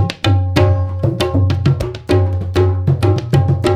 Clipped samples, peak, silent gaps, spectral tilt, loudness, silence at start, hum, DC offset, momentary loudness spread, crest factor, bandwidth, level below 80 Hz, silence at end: under 0.1%; 0 dBFS; none; -7.5 dB/octave; -15 LUFS; 0 s; none; under 0.1%; 3 LU; 14 dB; 11.5 kHz; -32 dBFS; 0 s